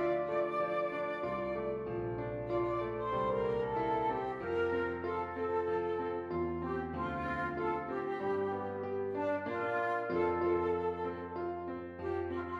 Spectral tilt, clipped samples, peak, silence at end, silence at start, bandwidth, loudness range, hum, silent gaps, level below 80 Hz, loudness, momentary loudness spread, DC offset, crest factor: -8.5 dB/octave; under 0.1%; -20 dBFS; 0 s; 0 s; 7 kHz; 2 LU; none; none; -60 dBFS; -36 LUFS; 5 LU; under 0.1%; 14 dB